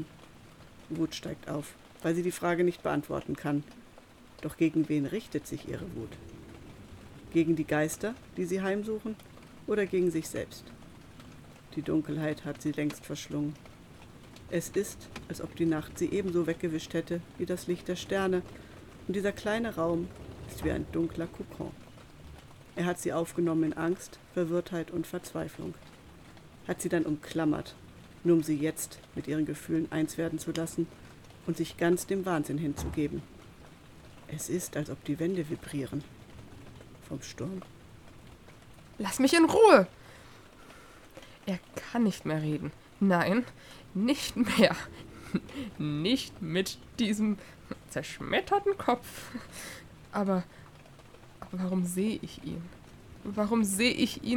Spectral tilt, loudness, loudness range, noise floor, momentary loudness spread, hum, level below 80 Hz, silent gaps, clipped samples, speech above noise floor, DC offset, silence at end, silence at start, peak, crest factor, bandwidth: -5.5 dB/octave; -31 LUFS; 9 LU; -54 dBFS; 22 LU; none; -58 dBFS; none; under 0.1%; 23 dB; under 0.1%; 0 s; 0 s; -4 dBFS; 28 dB; 18.5 kHz